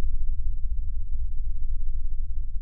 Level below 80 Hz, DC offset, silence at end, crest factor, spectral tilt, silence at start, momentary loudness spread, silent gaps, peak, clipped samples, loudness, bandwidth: -24 dBFS; 4%; 0 s; 8 dB; -12.5 dB/octave; 0 s; 2 LU; none; -12 dBFS; under 0.1%; -35 LUFS; 0.2 kHz